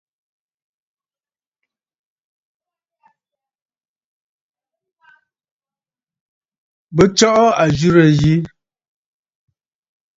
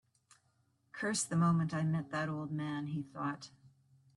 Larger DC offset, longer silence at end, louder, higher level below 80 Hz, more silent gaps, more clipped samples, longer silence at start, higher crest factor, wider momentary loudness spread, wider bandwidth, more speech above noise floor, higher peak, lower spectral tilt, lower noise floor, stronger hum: neither; first, 1.7 s vs 0.5 s; first, -13 LUFS vs -36 LUFS; first, -48 dBFS vs -74 dBFS; neither; neither; first, 6.9 s vs 0.95 s; about the same, 20 dB vs 18 dB; second, 9 LU vs 12 LU; second, 8 kHz vs 11.5 kHz; first, over 78 dB vs 40 dB; first, 0 dBFS vs -20 dBFS; about the same, -5.5 dB/octave vs -5.5 dB/octave; first, under -90 dBFS vs -75 dBFS; neither